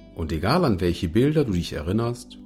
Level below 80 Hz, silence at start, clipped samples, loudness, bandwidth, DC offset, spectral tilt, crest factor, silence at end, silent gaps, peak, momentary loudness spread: -40 dBFS; 0 s; under 0.1%; -23 LUFS; 15.5 kHz; under 0.1%; -7 dB/octave; 14 dB; 0 s; none; -8 dBFS; 6 LU